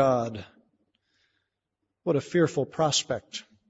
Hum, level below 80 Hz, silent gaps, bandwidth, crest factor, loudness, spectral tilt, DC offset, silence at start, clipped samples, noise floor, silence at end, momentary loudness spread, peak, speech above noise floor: none; -66 dBFS; none; 8 kHz; 20 dB; -27 LUFS; -4.5 dB/octave; under 0.1%; 0 s; under 0.1%; -82 dBFS; 0.3 s; 11 LU; -10 dBFS; 56 dB